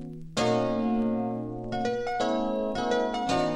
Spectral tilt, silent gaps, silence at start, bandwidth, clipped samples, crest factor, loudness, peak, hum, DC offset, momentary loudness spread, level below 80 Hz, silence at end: -5.5 dB/octave; none; 0 s; 11 kHz; under 0.1%; 14 dB; -28 LUFS; -14 dBFS; none; under 0.1%; 6 LU; -50 dBFS; 0 s